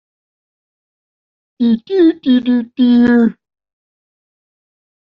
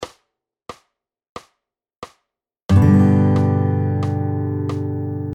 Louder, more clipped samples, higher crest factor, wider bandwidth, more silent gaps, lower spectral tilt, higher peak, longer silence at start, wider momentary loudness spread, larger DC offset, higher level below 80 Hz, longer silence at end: first, -13 LUFS vs -17 LUFS; neither; about the same, 14 dB vs 16 dB; second, 5.4 kHz vs 8.4 kHz; second, none vs 1.29-1.36 s, 1.96-2.02 s, 2.65-2.69 s; second, -5 dB/octave vs -9 dB/octave; about the same, -2 dBFS vs -2 dBFS; first, 1.6 s vs 0 s; second, 7 LU vs 12 LU; neither; second, -54 dBFS vs -44 dBFS; first, 1.85 s vs 0 s